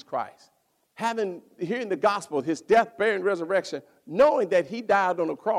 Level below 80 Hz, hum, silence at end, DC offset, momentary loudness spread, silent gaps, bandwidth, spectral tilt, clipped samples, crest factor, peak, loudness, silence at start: -66 dBFS; none; 0 s; under 0.1%; 12 LU; none; 13.5 kHz; -5 dB/octave; under 0.1%; 18 dB; -6 dBFS; -25 LUFS; 0.1 s